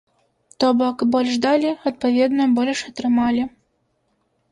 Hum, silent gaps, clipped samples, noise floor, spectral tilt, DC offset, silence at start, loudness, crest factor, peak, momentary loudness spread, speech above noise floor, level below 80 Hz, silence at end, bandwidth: none; none; under 0.1%; -68 dBFS; -4.5 dB/octave; under 0.1%; 0.6 s; -19 LUFS; 14 dB; -6 dBFS; 5 LU; 49 dB; -58 dBFS; 1.05 s; 10.5 kHz